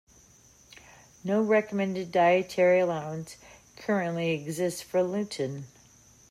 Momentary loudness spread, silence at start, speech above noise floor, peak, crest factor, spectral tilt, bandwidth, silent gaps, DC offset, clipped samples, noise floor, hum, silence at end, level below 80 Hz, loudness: 16 LU; 1.25 s; 31 dB; -12 dBFS; 16 dB; -5.5 dB/octave; 15 kHz; none; under 0.1%; under 0.1%; -58 dBFS; none; 0.65 s; -68 dBFS; -27 LUFS